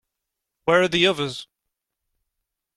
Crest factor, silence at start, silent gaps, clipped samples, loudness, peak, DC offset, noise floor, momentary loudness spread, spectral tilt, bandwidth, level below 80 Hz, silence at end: 20 dB; 0.65 s; none; under 0.1%; -20 LUFS; -4 dBFS; under 0.1%; -83 dBFS; 12 LU; -4.5 dB/octave; 13 kHz; -58 dBFS; 1.3 s